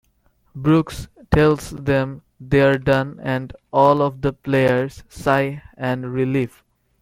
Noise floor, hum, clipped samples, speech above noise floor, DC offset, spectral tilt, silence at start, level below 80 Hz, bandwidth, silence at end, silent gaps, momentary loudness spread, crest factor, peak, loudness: -61 dBFS; none; under 0.1%; 42 dB; under 0.1%; -7 dB/octave; 0.55 s; -42 dBFS; 15.5 kHz; 0.55 s; none; 11 LU; 18 dB; -2 dBFS; -20 LUFS